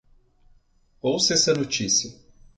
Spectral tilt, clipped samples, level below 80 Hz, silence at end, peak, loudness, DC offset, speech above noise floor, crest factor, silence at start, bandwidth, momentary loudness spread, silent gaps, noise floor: -2.5 dB/octave; under 0.1%; -58 dBFS; 0.45 s; -6 dBFS; -21 LUFS; under 0.1%; 37 dB; 20 dB; 1.05 s; 11 kHz; 10 LU; none; -60 dBFS